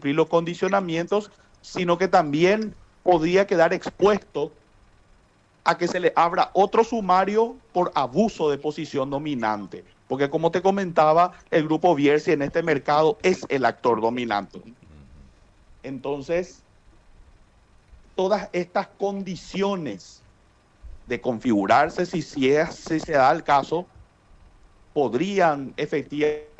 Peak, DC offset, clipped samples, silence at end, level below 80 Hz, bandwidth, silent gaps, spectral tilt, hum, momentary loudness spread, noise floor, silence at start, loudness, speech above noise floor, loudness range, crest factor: -6 dBFS; under 0.1%; under 0.1%; 0.15 s; -54 dBFS; 8.2 kHz; none; -6 dB/octave; none; 11 LU; -59 dBFS; 0 s; -23 LUFS; 36 dB; 8 LU; 18 dB